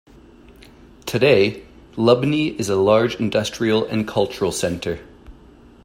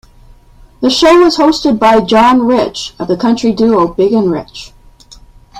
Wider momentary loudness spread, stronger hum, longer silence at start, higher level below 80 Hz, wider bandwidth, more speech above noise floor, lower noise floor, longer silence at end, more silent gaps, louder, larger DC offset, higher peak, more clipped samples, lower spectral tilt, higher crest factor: about the same, 12 LU vs 11 LU; neither; first, 1.05 s vs 0.8 s; second, -50 dBFS vs -40 dBFS; first, 16 kHz vs 13 kHz; about the same, 28 dB vs 31 dB; first, -46 dBFS vs -40 dBFS; first, 0.55 s vs 0 s; neither; second, -19 LUFS vs -10 LUFS; neither; about the same, -2 dBFS vs 0 dBFS; neither; about the same, -5.5 dB/octave vs -5 dB/octave; first, 18 dB vs 12 dB